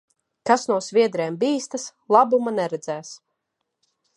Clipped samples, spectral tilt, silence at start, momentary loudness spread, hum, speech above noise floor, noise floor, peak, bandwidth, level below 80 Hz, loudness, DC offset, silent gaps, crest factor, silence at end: under 0.1%; -4.5 dB/octave; 0.45 s; 14 LU; none; 57 dB; -79 dBFS; -2 dBFS; 11 kHz; -78 dBFS; -22 LUFS; under 0.1%; none; 20 dB; 1 s